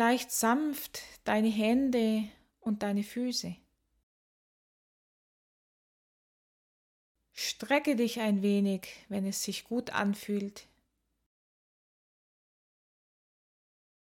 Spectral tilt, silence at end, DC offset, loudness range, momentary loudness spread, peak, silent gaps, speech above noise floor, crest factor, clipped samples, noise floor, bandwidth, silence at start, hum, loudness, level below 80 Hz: -4.5 dB/octave; 3.45 s; under 0.1%; 11 LU; 11 LU; -14 dBFS; 4.03-7.15 s; 47 dB; 20 dB; under 0.1%; -78 dBFS; 17.5 kHz; 0 s; none; -31 LUFS; -70 dBFS